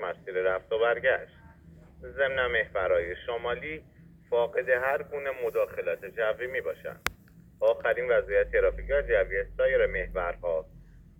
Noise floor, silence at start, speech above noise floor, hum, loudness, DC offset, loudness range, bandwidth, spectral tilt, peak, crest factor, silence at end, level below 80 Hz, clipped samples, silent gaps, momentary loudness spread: -54 dBFS; 0 s; 26 dB; none; -28 LUFS; under 0.1%; 4 LU; 18 kHz; -5 dB/octave; -6 dBFS; 24 dB; 0.2 s; -46 dBFS; under 0.1%; none; 9 LU